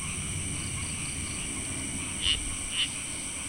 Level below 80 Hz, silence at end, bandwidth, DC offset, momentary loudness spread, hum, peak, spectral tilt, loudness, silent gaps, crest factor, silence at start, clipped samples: -44 dBFS; 0 s; 16 kHz; under 0.1%; 5 LU; none; -14 dBFS; -1.5 dB/octave; -30 LUFS; none; 20 dB; 0 s; under 0.1%